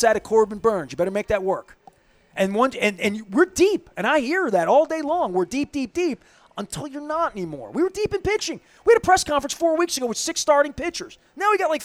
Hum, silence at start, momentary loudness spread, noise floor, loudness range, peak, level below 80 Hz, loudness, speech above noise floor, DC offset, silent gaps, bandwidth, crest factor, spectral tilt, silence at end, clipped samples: none; 0 s; 12 LU; -53 dBFS; 5 LU; -4 dBFS; -50 dBFS; -22 LUFS; 31 dB; under 0.1%; none; 15.5 kHz; 18 dB; -3.5 dB/octave; 0 s; under 0.1%